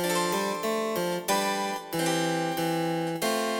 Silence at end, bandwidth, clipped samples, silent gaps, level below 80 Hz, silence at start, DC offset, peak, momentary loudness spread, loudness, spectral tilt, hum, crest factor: 0 s; over 20 kHz; under 0.1%; none; -70 dBFS; 0 s; under 0.1%; -14 dBFS; 3 LU; -28 LUFS; -4 dB/octave; none; 14 dB